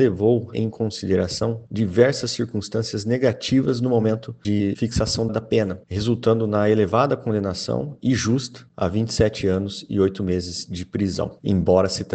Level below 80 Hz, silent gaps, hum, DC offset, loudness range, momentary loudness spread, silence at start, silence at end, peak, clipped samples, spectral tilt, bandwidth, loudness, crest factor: -44 dBFS; none; none; under 0.1%; 2 LU; 8 LU; 0 s; 0 s; -2 dBFS; under 0.1%; -6 dB/octave; 9 kHz; -22 LUFS; 20 dB